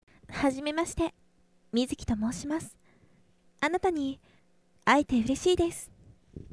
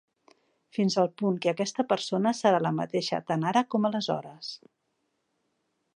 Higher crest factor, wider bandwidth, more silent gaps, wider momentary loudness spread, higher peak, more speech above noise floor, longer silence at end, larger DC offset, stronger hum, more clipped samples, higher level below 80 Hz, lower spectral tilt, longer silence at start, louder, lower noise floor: about the same, 22 dB vs 20 dB; about the same, 11 kHz vs 10.5 kHz; neither; first, 17 LU vs 12 LU; about the same, -8 dBFS vs -10 dBFS; second, 39 dB vs 50 dB; second, 0.1 s vs 1.4 s; neither; neither; neither; first, -50 dBFS vs -78 dBFS; about the same, -4.5 dB/octave vs -5.5 dB/octave; second, 0.3 s vs 0.75 s; about the same, -29 LUFS vs -27 LUFS; second, -67 dBFS vs -77 dBFS